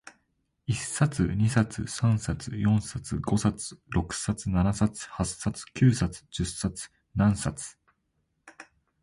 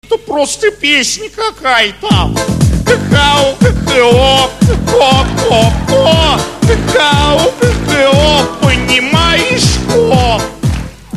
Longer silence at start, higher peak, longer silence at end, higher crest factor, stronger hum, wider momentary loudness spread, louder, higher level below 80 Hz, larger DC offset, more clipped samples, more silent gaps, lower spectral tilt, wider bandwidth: about the same, 0.05 s vs 0.1 s; second, -10 dBFS vs 0 dBFS; first, 0.4 s vs 0 s; first, 18 dB vs 10 dB; neither; first, 9 LU vs 6 LU; second, -28 LUFS vs -10 LUFS; second, -44 dBFS vs -22 dBFS; second, under 0.1% vs 0.3%; second, under 0.1% vs 0.5%; neither; about the same, -5.5 dB/octave vs -4.5 dB/octave; second, 11.5 kHz vs 14.5 kHz